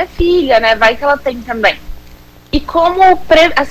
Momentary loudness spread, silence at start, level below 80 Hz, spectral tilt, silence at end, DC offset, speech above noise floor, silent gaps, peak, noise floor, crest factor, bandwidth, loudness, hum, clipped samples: 11 LU; 0 s; -30 dBFS; -4.5 dB/octave; 0 s; under 0.1%; 27 dB; none; 0 dBFS; -37 dBFS; 12 dB; 16 kHz; -11 LUFS; none; under 0.1%